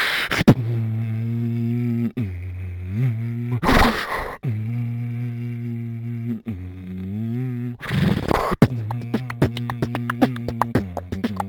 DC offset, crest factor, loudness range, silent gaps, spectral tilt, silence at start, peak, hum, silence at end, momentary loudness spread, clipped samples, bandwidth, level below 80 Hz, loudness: under 0.1%; 20 dB; 6 LU; none; -6.5 dB/octave; 0 s; -2 dBFS; none; 0 s; 12 LU; under 0.1%; 19 kHz; -36 dBFS; -23 LUFS